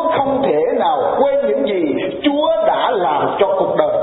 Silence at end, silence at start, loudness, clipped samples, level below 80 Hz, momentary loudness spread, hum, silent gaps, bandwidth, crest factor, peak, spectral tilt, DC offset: 0 s; 0 s; -16 LUFS; under 0.1%; -52 dBFS; 2 LU; none; none; 4.1 kHz; 14 dB; -2 dBFS; -10.5 dB/octave; under 0.1%